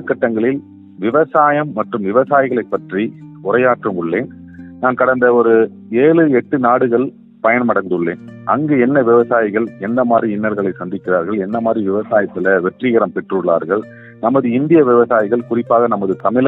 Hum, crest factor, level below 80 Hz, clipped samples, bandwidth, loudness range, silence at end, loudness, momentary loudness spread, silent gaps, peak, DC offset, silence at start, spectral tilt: none; 14 dB; -60 dBFS; under 0.1%; 4 kHz; 3 LU; 0 s; -15 LUFS; 9 LU; none; 0 dBFS; under 0.1%; 0 s; -10.5 dB/octave